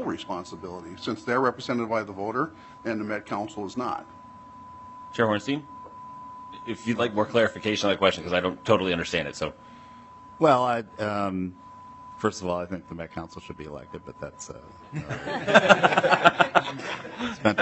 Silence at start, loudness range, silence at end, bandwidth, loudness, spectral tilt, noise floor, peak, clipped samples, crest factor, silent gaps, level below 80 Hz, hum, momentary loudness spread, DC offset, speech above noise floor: 0 s; 10 LU; 0 s; 8.4 kHz; -25 LUFS; -5 dB/octave; -47 dBFS; 0 dBFS; under 0.1%; 26 dB; none; -62 dBFS; none; 22 LU; under 0.1%; 21 dB